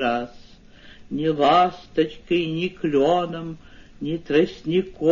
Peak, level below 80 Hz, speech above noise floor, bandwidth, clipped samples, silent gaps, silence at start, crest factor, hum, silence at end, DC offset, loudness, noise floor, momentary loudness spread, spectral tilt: -6 dBFS; -52 dBFS; 25 dB; 7.4 kHz; under 0.1%; none; 0 s; 18 dB; none; 0 s; under 0.1%; -22 LUFS; -47 dBFS; 16 LU; -7 dB/octave